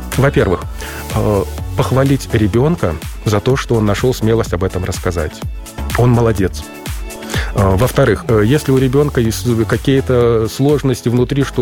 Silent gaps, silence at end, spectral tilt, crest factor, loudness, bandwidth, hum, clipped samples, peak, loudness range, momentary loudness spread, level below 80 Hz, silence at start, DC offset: none; 0 s; -6.5 dB/octave; 12 dB; -15 LUFS; 17 kHz; none; under 0.1%; -2 dBFS; 4 LU; 9 LU; -28 dBFS; 0 s; under 0.1%